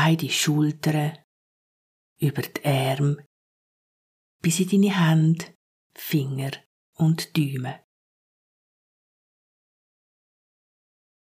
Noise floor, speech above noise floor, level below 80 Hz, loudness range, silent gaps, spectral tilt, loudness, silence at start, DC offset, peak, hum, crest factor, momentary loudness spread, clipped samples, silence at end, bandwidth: under -90 dBFS; over 67 dB; -72 dBFS; 6 LU; 1.24-2.16 s, 3.26-4.39 s, 5.55-5.90 s, 6.66-6.93 s; -5.5 dB/octave; -24 LUFS; 0 s; under 0.1%; -8 dBFS; none; 18 dB; 14 LU; under 0.1%; 3.6 s; 15.5 kHz